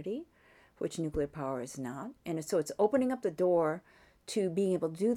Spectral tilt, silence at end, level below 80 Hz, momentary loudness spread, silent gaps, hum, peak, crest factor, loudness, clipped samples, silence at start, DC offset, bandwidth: -6 dB/octave; 0 s; -60 dBFS; 12 LU; none; none; -16 dBFS; 18 dB; -33 LUFS; under 0.1%; 0 s; under 0.1%; 16 kHz